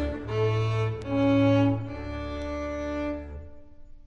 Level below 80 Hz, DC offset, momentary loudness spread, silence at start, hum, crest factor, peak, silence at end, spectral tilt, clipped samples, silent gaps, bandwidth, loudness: -42 dBFS; under 0.1%; 13 LU; 0 s; none; 16 dB; -12 dBFS; 0.05 s; -8 dB/octave; under 0.1%; none; 7.2 kHz; -27 LUFS